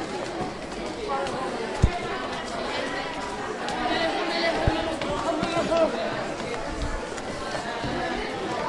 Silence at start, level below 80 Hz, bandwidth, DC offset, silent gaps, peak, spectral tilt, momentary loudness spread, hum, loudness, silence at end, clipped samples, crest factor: 0 s; -40 dBFS; 11.5 kHz; under 0.1%; none; -4 dBFS; -5 dB/octave; 7 LU; none; -28 LUFS; 0 s; under 0.1%; 22 dB